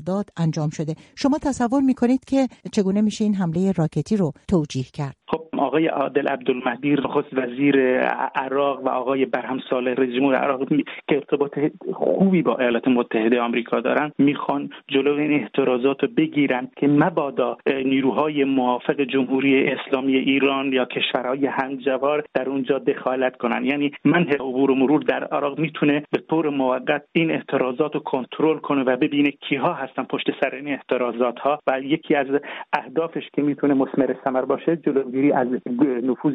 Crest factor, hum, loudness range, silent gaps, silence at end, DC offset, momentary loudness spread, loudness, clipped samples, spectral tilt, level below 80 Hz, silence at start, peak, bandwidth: 16 dB; none; 2 LU; none; 0 s; under 0.1%; 6 LU; -22 LUFS; under 0.1%; -6.5 dB/octave; -58 dBFS; 0 s; -4 dBFS; 9.4 kHz